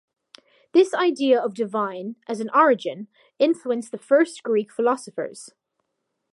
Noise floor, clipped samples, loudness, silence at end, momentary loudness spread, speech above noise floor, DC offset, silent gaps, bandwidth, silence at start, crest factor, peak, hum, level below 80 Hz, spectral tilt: -78 dBFS; under 0.1%; -22 LUFS; 0.85 s; 14 LU; 56 dB; under 0.1%; none; 11.5 kHz; 0.75 s; 18 dB; -4 dBFS; none; -82 dBFS; -4.5 dB/octave